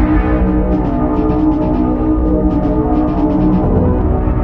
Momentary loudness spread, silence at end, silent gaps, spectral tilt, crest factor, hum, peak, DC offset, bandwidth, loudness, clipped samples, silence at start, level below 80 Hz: 2 LU; 0 s; none; -11.5 dB/octave; 10 dB; none; -2 dBFS; under 0.1%; 4.4 kHz; -14 LUFS; under 0.1%; 0 s; -18 dBFS